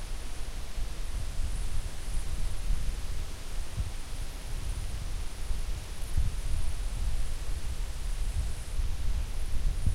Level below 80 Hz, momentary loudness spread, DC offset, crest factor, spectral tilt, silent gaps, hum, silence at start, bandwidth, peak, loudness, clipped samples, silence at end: -32 dBFS; 5 LU; under 0.1%; 14 dB; -4.5 dB/octave; none; none; 0 s; 14 kHz; -14 dBFS; -38 LUFS; under 0.1%; 0 s